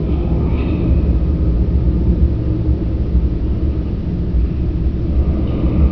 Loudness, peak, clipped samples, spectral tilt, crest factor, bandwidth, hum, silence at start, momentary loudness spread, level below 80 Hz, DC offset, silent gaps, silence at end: -18 LUFS; -2 dBFS; under 0.1%; -11.5 dB/octave; 12 dB; 5.4 kHz; none; 0 s; 3 LU; -16 dBFS; 1%; none; 0 s